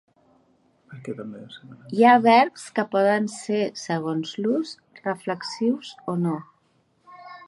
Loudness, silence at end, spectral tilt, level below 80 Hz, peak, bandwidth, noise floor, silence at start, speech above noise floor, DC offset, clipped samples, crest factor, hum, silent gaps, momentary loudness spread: -23 LUFS; 0.05 s; -5.5 dB/octave; -74 dBFS; -2 dBFS; 11.5 kHz; -65 dBFS; 0.9 s; 42 dB; under 0.1%; under 0.1%; 22 dB; none; none; 20 LU